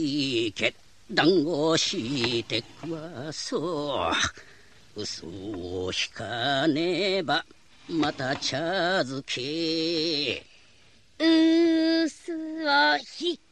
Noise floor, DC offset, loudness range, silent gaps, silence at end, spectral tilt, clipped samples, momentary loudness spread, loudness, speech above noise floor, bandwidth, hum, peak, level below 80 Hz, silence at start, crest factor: -59 dBFS; 0.2%; 6 LU; none; 0.15 s; -4 dB/octave; under 0.1%; 13 LU; -26 LUFS; 33 dB; 9.6 kHz; none; -8 dBFS; -60 dBFS; 0 s; 20 dB